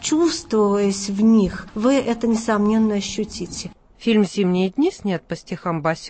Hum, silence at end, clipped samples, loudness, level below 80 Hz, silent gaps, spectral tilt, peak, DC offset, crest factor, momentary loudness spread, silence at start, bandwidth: none; 0 s; under 0.1%; -20 LUFS; -48 dBFS; none; -5.5 dB/octave; -6 dBFS; under 0.1%; 14 dB; 10 LU; 0 s; 8.8 kHz